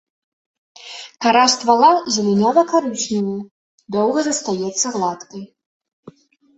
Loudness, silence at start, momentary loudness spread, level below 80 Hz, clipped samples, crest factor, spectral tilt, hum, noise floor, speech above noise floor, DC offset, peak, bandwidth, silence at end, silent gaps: -17 LUFS; 0.8 s; 20 LU; -64 dBFS; under 0.1%; 18 dB; -3.5 dB/octave; none; -45 dBFS; 28 dB; under 0.1%; -2 dBFS; 8.4 kHz; 0.45 s; 3.51-3.78 s, 5.66-5.80 s, 5.93-6.03 s